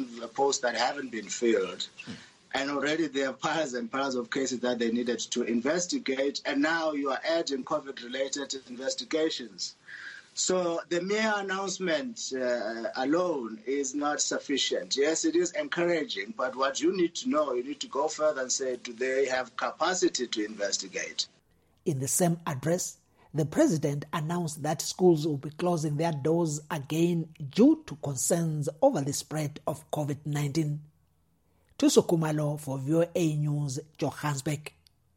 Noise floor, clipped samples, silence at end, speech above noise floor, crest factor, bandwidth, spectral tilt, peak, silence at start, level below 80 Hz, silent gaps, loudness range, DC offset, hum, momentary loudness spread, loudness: -70 dBFS; under 0.1%; 0.5 s; 41 dB; 22 dB; 16.5 kHz; -4.5 dB/octave; -8 dBFS; 0 s; -70 dBFS; none; 3 LU; under 0.1%; none; 9 LU; -29 LUFS